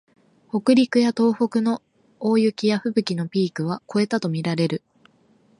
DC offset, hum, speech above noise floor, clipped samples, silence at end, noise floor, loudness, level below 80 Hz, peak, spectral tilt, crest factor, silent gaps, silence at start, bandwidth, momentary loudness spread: under 0.1%; none; 38 dB; under 0.1%; 0.8 s; -59 dBFS; -22 LUFS; -70 dBFS; -4 dBFS; -6.5 dB/octave; 18 dB; none; 0.55 s; 11 kHz; 9 LU